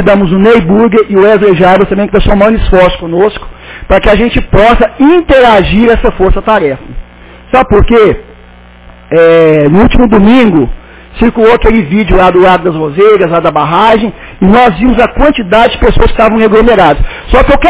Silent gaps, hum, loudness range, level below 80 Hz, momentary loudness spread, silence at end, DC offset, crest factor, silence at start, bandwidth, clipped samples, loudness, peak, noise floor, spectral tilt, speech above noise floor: none; none; 2 LU; -18 dBFS; 6 LU; 0 s; under 0.1%; 6 dB; 0 s; 4 kHz; 5%; -6 LUFS; 0 dBFS; -33 dBFS; -10.5 dB/octave; 28 dB